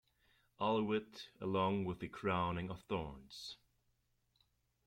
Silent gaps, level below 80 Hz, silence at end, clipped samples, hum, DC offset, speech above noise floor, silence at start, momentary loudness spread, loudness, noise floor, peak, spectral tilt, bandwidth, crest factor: none; -66 dBFS; 1.3 s; under 0.1%; none; under 0.1%; 41 dB; 0.6 s; 14 LU; -40 LUFS; -80 dBFS; -24 dBFS; -6.5 dB/octave; 15.5 kHz; 18 dB